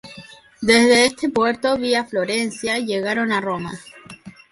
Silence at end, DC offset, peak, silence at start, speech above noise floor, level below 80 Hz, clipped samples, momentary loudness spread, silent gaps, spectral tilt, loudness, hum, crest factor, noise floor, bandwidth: 0.2 s; under 0.1%; -4 dBFS; 0.05 s; 24 dB; -56 dBFS; under 0.1%; 20 LU; none; -3.5 dB/octave; -19 LUFS; none; 16 dB; -43 dBFS; 11.5 kHz